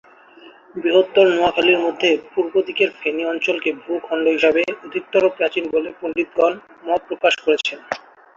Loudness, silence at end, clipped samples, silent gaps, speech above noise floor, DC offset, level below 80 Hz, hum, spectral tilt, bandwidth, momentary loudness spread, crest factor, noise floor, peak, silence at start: -19 LUFS; 0.4 s; under 0.1%; none; 27 dB; under 0.1%; -60 dBFS; none; -4 dB/octave; 7.6 kHz; 10 LU; 18 dB; -46 dBFS; -2 dBFS; 0.45 s